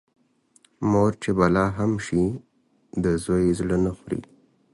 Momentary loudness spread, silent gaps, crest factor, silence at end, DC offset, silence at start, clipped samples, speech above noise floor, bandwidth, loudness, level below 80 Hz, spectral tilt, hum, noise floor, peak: 12 LU; none; 18 dB; 0.5 s; under 0.1%; 0.8 s; under 0.1%; 39 dB; 11.5 kHz; -24 LUFS; -44 dBFS; -7.5 dB/octave; none; -61 dBFS; -6 dBFS